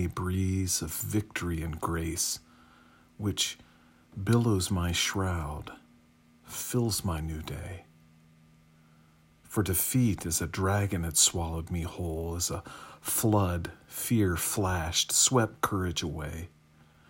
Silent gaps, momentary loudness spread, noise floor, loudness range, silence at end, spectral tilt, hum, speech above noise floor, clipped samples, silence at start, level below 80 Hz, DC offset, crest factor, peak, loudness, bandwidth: none; 15 LU; -61 dBFS; 8 LU; 0.6 s; -4 dB/octave; none; 31 dB; under 0.1%; 0 s; -50 dBFS; under 0.1%; 22 dB; -8 dBFS; -29 LUFS; 16.5 kHz